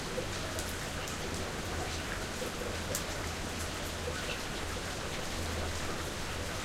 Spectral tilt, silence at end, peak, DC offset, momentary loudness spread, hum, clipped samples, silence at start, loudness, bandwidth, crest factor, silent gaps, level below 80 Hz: -3.5 dB/octave; 0 s; -14 dBFS; under 0.1%; 2 LU; none; under 0.1%; 0 s; -37 LUFS; 16 kHz; 22 dB; none; -46 dBFS